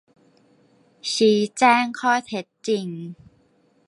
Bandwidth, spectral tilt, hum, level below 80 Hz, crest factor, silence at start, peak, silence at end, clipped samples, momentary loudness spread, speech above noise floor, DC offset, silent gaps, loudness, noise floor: 11.5 kHz; -4 dB/octave; none; -70 dBFS; 20 dB; 1.05 s; -4 dBFS; 0.75 s; under 0.1%; 16 LU; 40 dB; under 0.1%; none; -21 LUFS; -61 dBFS